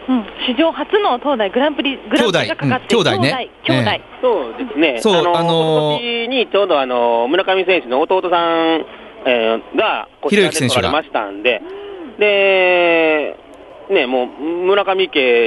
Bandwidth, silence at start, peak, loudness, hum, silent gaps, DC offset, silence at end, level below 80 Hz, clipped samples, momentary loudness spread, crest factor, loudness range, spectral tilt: 11.5 kHz; 0 s; 0 dBFS; -15 LUFS; none; none; under 0.1%; 0 s; -54 dBFS; under 0.1%; 7 LU; 14 dB; 2 LU; -4.5 dB/octave